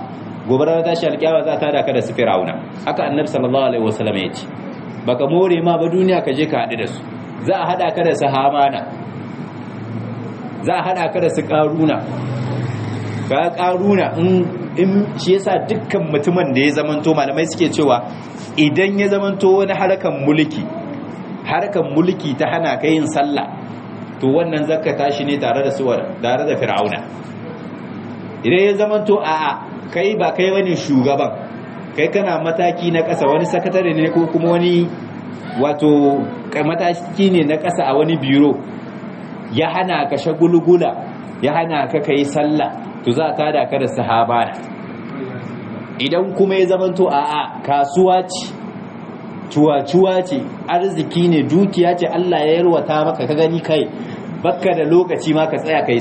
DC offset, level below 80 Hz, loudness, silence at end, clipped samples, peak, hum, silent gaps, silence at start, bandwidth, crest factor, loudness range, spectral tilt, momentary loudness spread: under 0.1%; -62 dBFS; -17 LUFS; 0 s; under 0.1%; -2 dBFS; none; none; 0 s; 8.8 kHz; 16 dB; 3 LU; -6.5 dB/octave; 15 LU